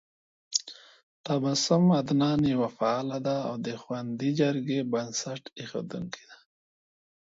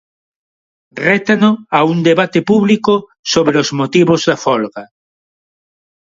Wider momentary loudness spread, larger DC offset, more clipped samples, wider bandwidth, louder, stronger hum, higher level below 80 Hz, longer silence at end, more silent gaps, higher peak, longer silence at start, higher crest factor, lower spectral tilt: first, 14 LU vs 6 LU; neither; neither; about the same, 7.8 kHz vs 7.8 kHz; second, -28 LUFS vs -13 LUFS; neither; second, -64 dBFS vs -56 dBFS; second, 0.85 s vs 1.25 s; first, 1.03-1.24 s vs 3.19-3.23 s; second, -8 dBFS vs 0 dBFS; second, 0.5 s vs 0.95 s; first, 20 dB vs 14 dB; about the same, -5 dB/octave vs -5.5 dB/octave